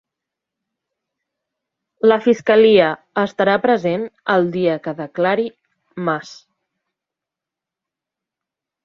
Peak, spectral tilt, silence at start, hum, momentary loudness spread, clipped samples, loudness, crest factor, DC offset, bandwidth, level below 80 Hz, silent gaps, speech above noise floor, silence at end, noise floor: -2 dBFS; -6.5 dB/octave; 2.05 s; none; 13 LU; under 0.1%; -17 LUFS; 18 dB; under 0.1%; 7.2 kHz; -64 dBFS; none; 70 dB; 2.5 s; -86 dBFS